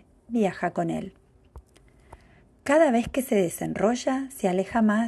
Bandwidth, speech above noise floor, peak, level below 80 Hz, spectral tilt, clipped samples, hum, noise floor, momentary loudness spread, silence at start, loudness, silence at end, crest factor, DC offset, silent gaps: 12.5 kHz; 32 dB; -8 dBFS; -54 dBFS; -5.5 dB/octave; under 0.1%; none; -56 dBFS; 10 LU; 0.3 s; -25 LUFS; 0 s; 18 dB; under 0.1%; none